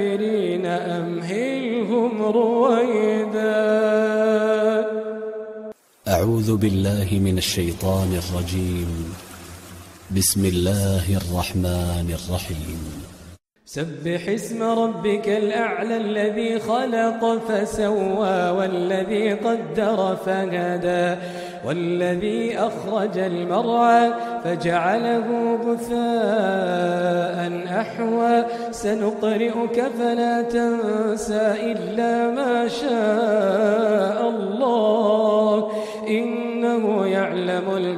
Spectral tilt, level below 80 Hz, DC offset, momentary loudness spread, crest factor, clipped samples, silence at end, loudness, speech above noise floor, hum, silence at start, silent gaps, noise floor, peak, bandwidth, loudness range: -5.5 dB/octave; -46 dBFS; under 0.1%; 9 LU; 16 dB; under 0.1%; 0 s; -21 LUFS; 24 dB; none; 0 s; none; -45 dBFS; -4 dBFS; 15.5 kHz; 4 LU